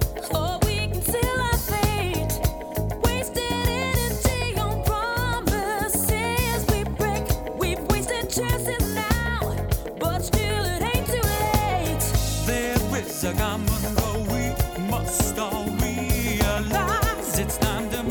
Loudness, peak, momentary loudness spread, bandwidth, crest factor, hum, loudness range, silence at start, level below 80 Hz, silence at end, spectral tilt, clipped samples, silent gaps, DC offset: -24 LUFS; -6 dBFS; 4 LU; 19 kHz; 18 dB; none; 1 LU; 0 s; -30 dBFS; 0 s; -4.5 dB/octave; under 0.1%; none; under 0.1%